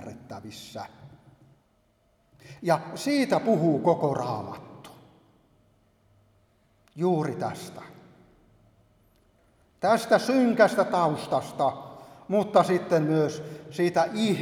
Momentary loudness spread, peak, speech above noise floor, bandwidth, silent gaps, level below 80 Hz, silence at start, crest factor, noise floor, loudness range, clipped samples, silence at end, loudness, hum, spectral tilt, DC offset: 20 LU; -4 dBFS; 42 dB; 17 kHz; none; -68 dBFS; 0 s; 24 dB; -67 dBFS; 10 LU; under 0.1%; 0 s; -25 LUFS; none; -6 dB/octave; under 0.1%